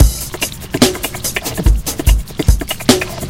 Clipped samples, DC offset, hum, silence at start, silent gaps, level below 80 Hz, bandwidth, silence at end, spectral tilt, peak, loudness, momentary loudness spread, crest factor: 0.5%; under 0.1%; none; 0 s; none; -18 dBFS; 17 kHz; 0 s; -4 dB/octave; 0 dBFS; -16 LUFS; 6 LU; 14 dB